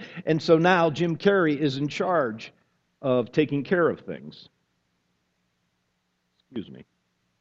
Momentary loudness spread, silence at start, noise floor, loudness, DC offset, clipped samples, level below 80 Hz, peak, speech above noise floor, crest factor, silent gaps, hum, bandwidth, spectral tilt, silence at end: 19 LU; 0 s; -74 dBFS; -23 LUFS; under 0.1%; under 0.1%; -68 dBFS; -4 dBFS; 51 dB; 22 dB; none; none; 7.8 kHz; -7 dB/octave; 0.6 s